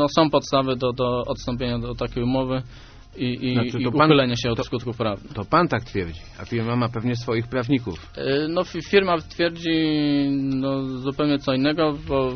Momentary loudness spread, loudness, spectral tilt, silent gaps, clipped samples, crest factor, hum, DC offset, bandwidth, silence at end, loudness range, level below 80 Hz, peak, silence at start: 9 LU; -23 LUFS; -5 dB/octave; none; under 0.1%; 22 dB; none; under 0.1%; 6.6 kHz; 0 s; 3 LU; -44 dBFS; -2 dBFS; 0 s